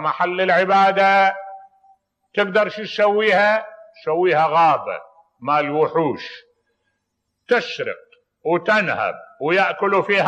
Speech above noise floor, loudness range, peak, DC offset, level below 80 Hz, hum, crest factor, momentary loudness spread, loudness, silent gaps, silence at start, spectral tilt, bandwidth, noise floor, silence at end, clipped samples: 57 dB; 5 LU; -6 dBFS; under 0.1%; -72 dBFS; none; 14 dB; 16 LU; -18 LUFS; none; 0 s; -5.5 dB/octave; 9.2 kHz; -75 dBFS; 0 s; under 0.1%